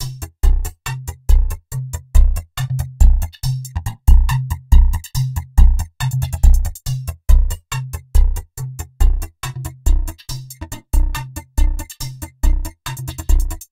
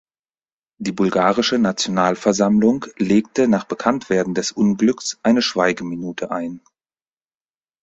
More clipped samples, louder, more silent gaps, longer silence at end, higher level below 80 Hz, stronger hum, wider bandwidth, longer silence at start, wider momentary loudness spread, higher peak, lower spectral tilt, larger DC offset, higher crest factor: first, 0.2% vs under 0.1%; about the same, -20 LUFS vs -19 LUFS; neither; second, 0.05 s vs 1.25 s; first, -16 dBFS vs -56 dBFS; neither; first, 16.5 kHz vs 8 kHz; second, 0 s vs 0.8 s; first, 12 LU vs 9 LU; about the same, 0 dBFS vs -2 dBFS; about the same, -5 dB/octave vs -5 dB/octave; neither; about the same, 16 dB vs 18 dB